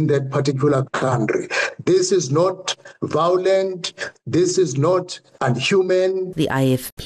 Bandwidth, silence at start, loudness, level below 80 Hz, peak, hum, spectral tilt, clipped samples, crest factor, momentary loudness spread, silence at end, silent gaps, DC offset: 13 kHz; 0 s; -19 LUFS; -58 dBFS; -8 dBFS; none; -5 dB/octave; under 0.1%; 12 dB; 8 LU; 0 s; 6.92-6.97 s; under 0.1%